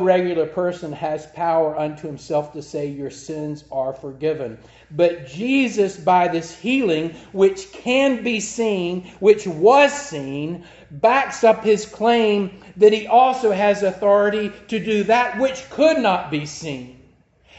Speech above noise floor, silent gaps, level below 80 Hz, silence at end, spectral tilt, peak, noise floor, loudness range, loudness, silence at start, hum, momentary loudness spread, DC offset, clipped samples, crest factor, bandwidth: 35 dB; none; -56 dBFS; 0.65 s; -5 dB/octave; -2 dBFS; -54 dBFS; 8 LU; -19 LUFS; 0 s; none; 13 LU; under 0.1%; under 0.1%; 18 dB; 8.2 kHz